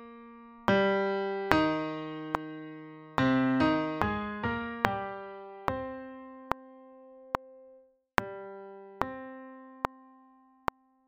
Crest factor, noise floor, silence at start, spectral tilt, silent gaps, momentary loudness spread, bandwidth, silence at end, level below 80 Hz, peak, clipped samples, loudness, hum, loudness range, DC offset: 32 dB; -61 dBFS; 0 s; -6.5 dB/octave; none; 20 LU; 10 kHz; 1.05 s; -56 dBFS; 0 dBFS; under 0.1%; -32 LUFS; none; 9 LU; under 0.1%